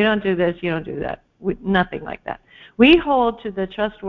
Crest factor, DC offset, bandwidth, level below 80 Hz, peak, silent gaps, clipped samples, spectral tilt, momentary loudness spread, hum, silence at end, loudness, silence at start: 18 dB; under 0.1%; 5.6 kHz; -44 dBFS; -2 dBFS; none; under 0.1%; -8 dB/octave; 17 LU; none; 0 s; -19 LUFS; 0 s